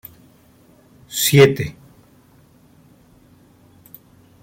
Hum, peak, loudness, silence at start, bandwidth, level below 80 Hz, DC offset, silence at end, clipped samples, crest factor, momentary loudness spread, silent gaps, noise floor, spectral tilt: none; -2 dBFS; -16 LUFS; 1.1 s; 16.5 kHz; -56 dBFS; under 0.1%; 2.7 s; under 0.1%; 22 dB; 19 LU; none; -52 dBFS; -4.5 dB/octave